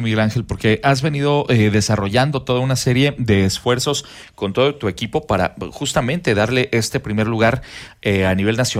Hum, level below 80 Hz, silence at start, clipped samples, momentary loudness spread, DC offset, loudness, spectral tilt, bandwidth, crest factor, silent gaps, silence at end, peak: none; -42 dBFS; 0 s; under 0.1%; 8 LU; under 0.1%; -18 LUFS; -5 dB/octave; 16 kHz; 14 dB; none; 0 s; -4 dBFS